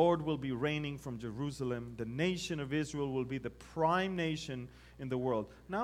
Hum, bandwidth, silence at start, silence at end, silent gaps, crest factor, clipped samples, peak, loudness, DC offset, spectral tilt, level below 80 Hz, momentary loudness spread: none; 15.5 kHz; 0 s; 0 s; none; 20 dB; under 0.1%; -16 dBFS; -36 LUFS; under 0.1%; -6 dB/octave; -60 dBFS; 10 LU